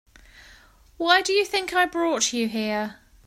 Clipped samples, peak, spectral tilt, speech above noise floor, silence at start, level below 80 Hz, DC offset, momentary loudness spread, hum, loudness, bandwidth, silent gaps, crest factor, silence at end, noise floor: under 0.1%; -4 dBFS; -2 dB/octave; 30 dB; 1 s; -56 dBFS; under 0.1%; 10 LU; none; -22 LUFS; 16 kHz; none; 22 dB; 0.35 s; -53 dBFS